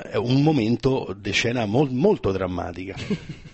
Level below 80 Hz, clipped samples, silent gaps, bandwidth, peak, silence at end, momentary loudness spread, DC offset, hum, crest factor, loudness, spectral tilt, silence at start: -44 dBFS; under 0.1%; none; 8.4 kHz; -6 dBFS; 0.05 s; 10 LU; under 0.1%; none; 16 dB; -23 LUFS; -6.5 dB/octave; 0 s